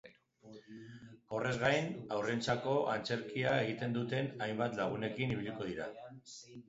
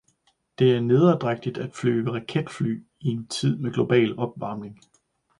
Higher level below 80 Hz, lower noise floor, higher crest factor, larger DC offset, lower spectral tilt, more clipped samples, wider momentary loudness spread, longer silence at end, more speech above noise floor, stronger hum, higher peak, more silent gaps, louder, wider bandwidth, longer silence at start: second, -68 dBFS vs -62 dBFS; second, -59 dBFS vs -67 dBFS; about the same, 20 dB vs 18 dB; neither; second, -4.5 dB/octave vs -7 dB/octave; neither; first, 19 LU vs 12 LU; second, 0.05 s vs 0.65 s; second, 23 dB vs 44 dB; neither; second, -18 dBFS vs -6 dBFS; neither; second, -36 LUFS vs -24 LUFS; second, 7.6 kHz vs 11 kHz; second, 0.05 s vs 0.6 s